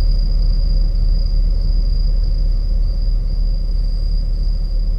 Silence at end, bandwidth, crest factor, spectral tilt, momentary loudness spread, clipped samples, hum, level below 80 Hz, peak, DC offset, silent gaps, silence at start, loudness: 0 s; 5.2 kHz; 8 dB; -8 dB/octave; 3 LU; under 0.1%; none; -14 dBFS; -6 dBFS; under 0.1%; none; 0 s; -21 LUFS